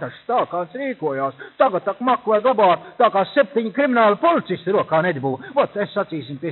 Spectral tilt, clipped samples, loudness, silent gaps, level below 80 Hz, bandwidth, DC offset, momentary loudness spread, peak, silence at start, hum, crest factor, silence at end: -4 dB/octave; under 0.1%; -20 LUFS; none; -70 dBFS; 4.3 kHz; under 0.1%; 9 LU; -2 dBFS; 0 s; none; 18 dB; 0 s